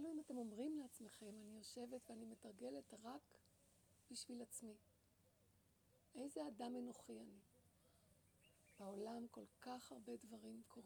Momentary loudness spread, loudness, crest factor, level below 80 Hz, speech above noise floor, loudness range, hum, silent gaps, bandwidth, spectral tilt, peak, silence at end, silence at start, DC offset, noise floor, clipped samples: 9 LU; -55 LUFS; 18 dB; -88 dBFS; 23 dB; 3 LU; none; none; over 20 kHz; -4 dB/octave; -38 dBFS; 0 s; 0 s; under 0.1%; -78 dBFS; under 0.1%